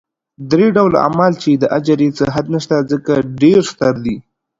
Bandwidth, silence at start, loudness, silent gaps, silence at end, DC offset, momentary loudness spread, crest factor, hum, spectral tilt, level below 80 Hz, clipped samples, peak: 7.8 kHz; 0.4 s; -14 LUFS; none; 0.4 s; under 0.1%; 7 LU; 14 dB; none; -7 dB/octave; -48 dBFS; under 0.1%; 0 dBFS